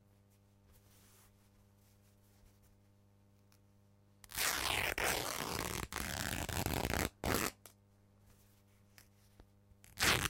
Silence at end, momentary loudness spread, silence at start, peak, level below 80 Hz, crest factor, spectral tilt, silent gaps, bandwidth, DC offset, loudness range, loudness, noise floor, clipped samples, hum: 0 s; 8 LU; 4.3 s; -14 dBFS; -54 dBFS; 28 dB; -2.5 dB/octave; none; 17 kHz; under 0.1%; 6 LU; -37 LUFS; -68 dBFS; under 0.1%; 50 Hz at -70 dBFS